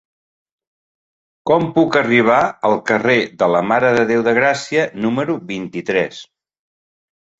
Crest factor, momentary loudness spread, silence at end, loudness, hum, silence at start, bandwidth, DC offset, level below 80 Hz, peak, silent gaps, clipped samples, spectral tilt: 16 dB; 10 LU; 1.15 s; -16 LUFS; none; 1.45 s; 8 kHz; under 0.1%; -58 dBFS; -2 dBFS; none; under 0.1%; -5.5 dB/octave